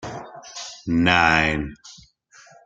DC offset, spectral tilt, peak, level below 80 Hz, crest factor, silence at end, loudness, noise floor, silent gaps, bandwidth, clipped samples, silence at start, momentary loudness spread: under 0.1%; -4.5 dB/octave; -2 dBFS; -44 dBFS; 22 dB; 0.7 s; -19 LUFS; -52 dBFS; none; 9 kHz; under 0.1%; 0 s; 20 LU